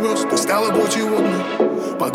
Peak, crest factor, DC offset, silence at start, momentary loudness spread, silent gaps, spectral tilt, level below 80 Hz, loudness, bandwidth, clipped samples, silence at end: -4 dBFS; 14 dB; under 0.1%; 0 s; 3 LU; none; -4 dB/octave; -66 dBFS; -18 LUFS; 17 kHz; under 0.1%; 0 s